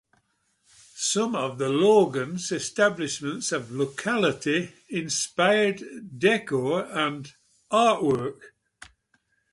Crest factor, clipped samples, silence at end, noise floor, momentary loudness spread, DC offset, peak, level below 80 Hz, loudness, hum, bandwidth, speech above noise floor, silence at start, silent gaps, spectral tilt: 18 dB; under 0.1%; 1.05 s; -70 dBFS; 9 LU; under 0.1%; -8 dBFS; -66 dBFS; -25 LUFS; none; 11.5 kHz; 45 dB; 0.95 s; none; -4 dB/octave